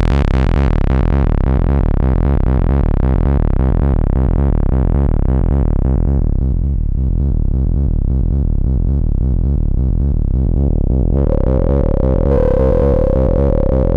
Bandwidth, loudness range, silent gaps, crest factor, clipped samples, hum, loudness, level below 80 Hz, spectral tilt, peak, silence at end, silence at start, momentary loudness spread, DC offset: 4.5 kHz; 2 LU; none; 10 dB; under 0.1%; none; -16 LUFS; -14 dBFS; -10.5 dB/octave; -2 dBFS; 0 s; 0 s; 3 LU; under 0.1%